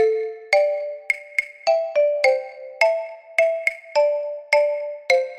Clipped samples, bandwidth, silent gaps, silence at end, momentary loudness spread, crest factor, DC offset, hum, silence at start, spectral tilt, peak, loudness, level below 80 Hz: under 0.1%; 14 kHz; none; 0 s; 8 LU; 18 dB; under 0.1%; none; 0 s; 0.5 dB/octave; -2 dBFS; -21 LUFS; -72 dBFS